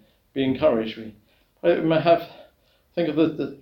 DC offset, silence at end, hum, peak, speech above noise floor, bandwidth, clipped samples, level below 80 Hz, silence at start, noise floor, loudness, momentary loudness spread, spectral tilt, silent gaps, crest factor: under 0.1%; 0.05 s; none; -6 dBFS; 40 dB; 16.5 kHz; under 0.1%; -58 dBFS; 0.35 s; -62 dBFS; -23 LUFS; 16 LU; -8.5 dB/octave; none; 18 dB